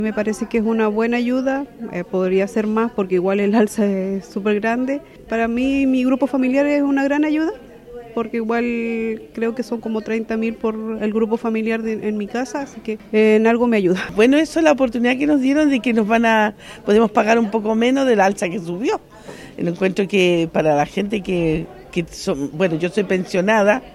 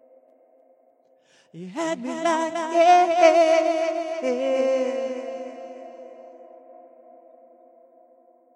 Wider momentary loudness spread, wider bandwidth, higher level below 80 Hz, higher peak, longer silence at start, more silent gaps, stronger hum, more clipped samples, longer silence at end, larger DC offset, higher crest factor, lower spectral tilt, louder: second, 10 LU vs 24 LU; first, 13 kHz vs 10.5 kHz; first, -50 dBFS vs under -90 dBFS; about the same, -2 dBFS vs -4 dBFS; second, 0 s vs 1.55 s; neither; neither; neither; second, 0 s vs 1.85 s; neither; about the same, 16 dB vs 20 dB; first, -6 dB/octave vs -3.5 dB/octave; about the same, -19 LUFS vs -21 LUFS